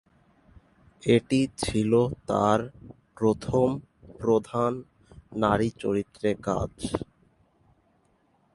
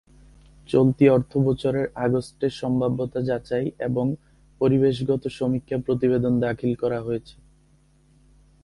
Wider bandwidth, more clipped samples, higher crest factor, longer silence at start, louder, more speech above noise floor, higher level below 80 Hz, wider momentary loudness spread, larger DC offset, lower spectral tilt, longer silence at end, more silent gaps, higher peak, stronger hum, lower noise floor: about the same, 11.5 kHz vs 11.5 kHz; neither; about the same, 20 dB vs 18 dB; first, 1.05 s vs 0.7 s; second, -26 LUFS vs -23 LUFS; first, 41 dB vs 36 dB; about the same, -50 dBFS vs -52 dBFS; about the same, 10 LU vs 8 LU; neither; second, -6.5 dB/octave vs -8.5 dB/octave; first, 1.5 s vs 1.35 s; neither; about the same, -6 dBFS vs -6 dBFS; neither; first, -66 dBFS vs -58 dBFS